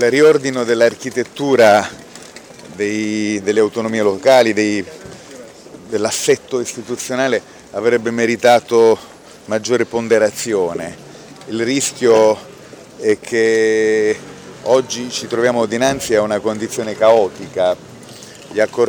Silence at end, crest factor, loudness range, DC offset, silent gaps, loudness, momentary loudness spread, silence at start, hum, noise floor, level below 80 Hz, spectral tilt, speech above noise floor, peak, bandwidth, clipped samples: 0 s; 14 dB; 2 LU; under 0.1%; none; -16 LUFS; 21 LU; 0 s; none; -38 dBFS; -56 dBFS; -4 dB/octave; 23 dB; -2 dBFS; over 20 kHz; under 0.1%